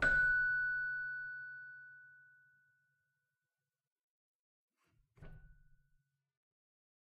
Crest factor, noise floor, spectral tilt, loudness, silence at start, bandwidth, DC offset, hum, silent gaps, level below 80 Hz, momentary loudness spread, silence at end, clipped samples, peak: 20 dB; under -90 dBFS; -4 dB/octave; -35 LUFS; 0 s; 8.4 kHz; under 0.1%; none; 3.87-3.96 s, 4.03-4.68 s; -60 dBFS; 23 LU; 1.65 s; under 0.1%; -22 dBFS